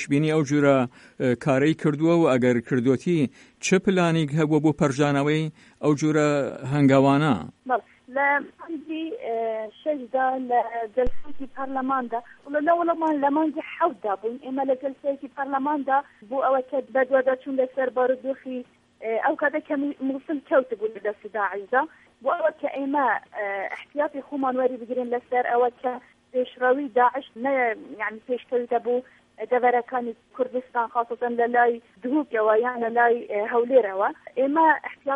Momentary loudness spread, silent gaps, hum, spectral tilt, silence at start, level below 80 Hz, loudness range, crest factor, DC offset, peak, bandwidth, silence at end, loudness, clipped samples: 10 LU; none; none; -6.5 dB/octave; 0 s; -54 dBFS; 5 LU; 18 dB; under 0.1%; -6 dBFS; 11 kHz; 0 s; -24 LUFS; under 0.1%